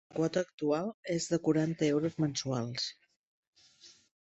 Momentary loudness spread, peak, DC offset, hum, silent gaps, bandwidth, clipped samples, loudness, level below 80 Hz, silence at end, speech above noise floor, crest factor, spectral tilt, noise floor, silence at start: 6 LU; -16 dBFS; under 0.1%; none; 0.54-0.58 s, 0.94-1.03 s, 3.16-3.53 s; 8.2 kHz; under 0.1%; -33 LUFS; -70 dBFS; 0.35 s; 28 dB; 18 dB; -5.5 dB/octave; -60 dBFS; 0.15 s